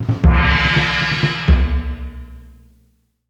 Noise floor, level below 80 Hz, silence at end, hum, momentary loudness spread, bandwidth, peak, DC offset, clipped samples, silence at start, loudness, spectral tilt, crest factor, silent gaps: -59 dBFS; -20 dBFS; 0.8 s; 60 Hz at -45 dBFS; 17 LU; 7.6 kHz; 0 dBFS; under 0.1%; under 0.1%; 0 s; -15 LUFS; -6 dB/octave; 16 dB; none